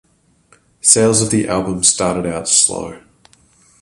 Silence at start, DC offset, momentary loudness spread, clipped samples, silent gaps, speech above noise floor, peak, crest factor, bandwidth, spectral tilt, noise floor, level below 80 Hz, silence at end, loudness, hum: 0.85 s; under 0.1%; 9 LU; under 0.1%; none; 39 dB; 0 dBFS; 18 dB; 16 kHz; -3 dB/octave; -54 dBFS; -46 dBFS; 0.85 s; -13 LUFS; none